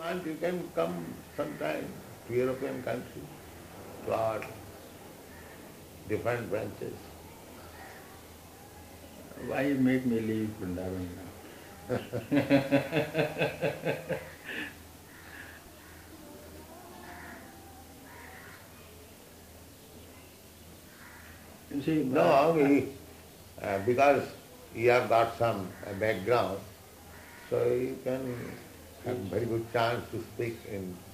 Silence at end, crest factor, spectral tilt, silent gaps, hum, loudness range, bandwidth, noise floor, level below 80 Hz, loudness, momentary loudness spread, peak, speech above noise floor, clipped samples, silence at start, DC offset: 0 s; 22 dB; -6 dB/octave; none; none; 20 LU; 15.5 kHz; -52 dBFS; -64 dBFS; -31 LUFS; 24 LU; -10 dBFS; 22 dB; under 0.1%; 0 s; under 0.1%